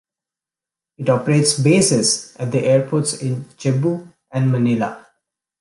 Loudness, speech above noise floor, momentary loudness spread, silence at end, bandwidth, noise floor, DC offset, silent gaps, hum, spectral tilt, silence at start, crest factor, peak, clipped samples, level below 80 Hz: -18 LUFS; 71 dB; 10 LU; 0.6 s; 11.5 kHz; -88 dBFS; under 0.1%; none; none; -5 dB/octave; 1 s; 16 dB; -2 dBFS; under 0.1%; -60 dBFS